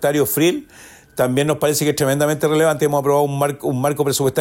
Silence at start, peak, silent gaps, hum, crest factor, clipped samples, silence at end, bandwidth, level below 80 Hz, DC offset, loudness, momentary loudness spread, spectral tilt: 0 s; -6 dBFS; none; none; 12 dB; under 0.1%; 0 s; 16.5 kHz; -56 dBFS; under 0.1%; -18 LUFS; 4 LU; -5 dB/octave